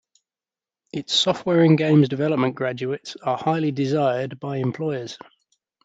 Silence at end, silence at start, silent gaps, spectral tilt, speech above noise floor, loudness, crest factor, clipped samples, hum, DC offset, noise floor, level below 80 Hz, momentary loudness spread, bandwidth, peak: 0.7 s; 0.95 s; none; -6 dB/octave; over 69 dB; -21 LUFS; 18 dB; under 0.1%; none; under 0.1%; under -90 dBFS; -66 dBFS; 13 LU; 8 kHz; -4 dBFS